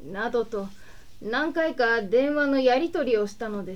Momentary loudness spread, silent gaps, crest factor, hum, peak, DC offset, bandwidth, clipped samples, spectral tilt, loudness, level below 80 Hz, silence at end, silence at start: 11 LU; none; 16 dB; none; -8 dBFS; 0.8%; 13 kHz; under 0.1%; -5.5 dB/octave; -25 LUFS; -54 dBFS; 0 s; 0 s